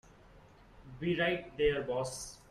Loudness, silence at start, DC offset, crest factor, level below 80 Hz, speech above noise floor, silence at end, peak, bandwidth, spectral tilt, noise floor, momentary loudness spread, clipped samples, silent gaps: -34 LUFS; 0.35 s; under 0.1%; 18 dB; -54 dBFS; 25 dB; 0.15 s; -18 dBFS; 14 kHz; -4.5 dB/octave; -58 dBFS; 11 LU; under 0.1%; none